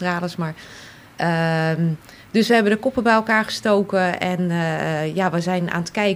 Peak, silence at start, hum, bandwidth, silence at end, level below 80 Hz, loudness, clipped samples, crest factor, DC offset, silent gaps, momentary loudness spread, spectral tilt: -4 dBFS; 0 s; none; 15.5 kHz; 0 s; -56 dBFS; -20 LUFS; under 0.1%; 16 dB; under 0.1%; none; 11 LU; -6 dB/octave